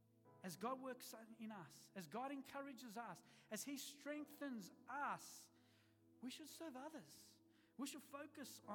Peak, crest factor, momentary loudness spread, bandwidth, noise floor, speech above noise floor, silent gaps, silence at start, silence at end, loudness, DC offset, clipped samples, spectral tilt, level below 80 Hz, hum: -34 dBFS; 20 dB; 10 LU; 19 kHz; -75 dBFS; 21 dB; none; 0 s; 0 s; -53 LUFS; under 0.1%; under 0.1%; -3.5 dB/octave; under -90 dBFS; none